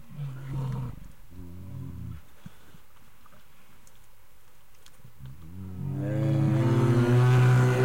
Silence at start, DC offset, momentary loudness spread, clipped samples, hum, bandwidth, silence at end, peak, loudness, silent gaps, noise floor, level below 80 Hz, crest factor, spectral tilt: 0.1 s; 0.7%; 26 LU; under 0.1%; none; 11 kHz; 0 s; -14 dBFS; -25 LUFS; none; -59 dBFS; -52 dBFS; 14 dB; -8 dB/octave